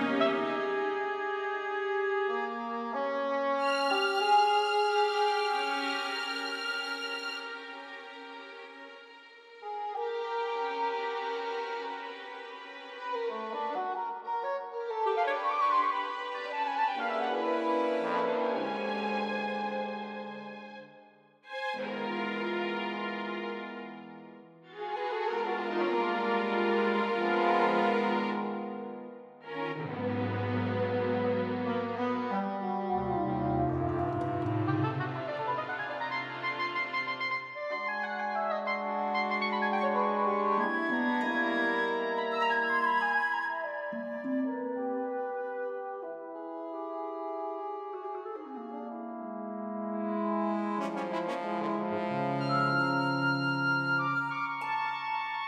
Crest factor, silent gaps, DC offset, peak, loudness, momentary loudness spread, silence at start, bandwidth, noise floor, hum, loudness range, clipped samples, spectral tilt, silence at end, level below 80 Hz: 18 dB; none; under 0.1%; -14 dBFS; -31 LUFS; 13 LU; 0 s; 13.5 kHz; -58 dBFS; none; 8 LU; under 0.1%; -6 dB/octave; 0 s; -66 dBFS